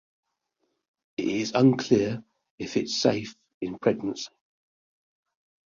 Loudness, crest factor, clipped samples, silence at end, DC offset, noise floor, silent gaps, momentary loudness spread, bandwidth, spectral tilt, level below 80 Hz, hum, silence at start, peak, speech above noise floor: -26 LUFS; 22 dB; under 0.1%; 1.4 s; under 0.1%; -77 dBFS; 2.50-2.58 s, 3.54-3.61 s; 17 LU; 7.6 kHz; -5.5 dB/octave; -64 dBFS; none; 1.2 s; -6 dBFS; 52 dB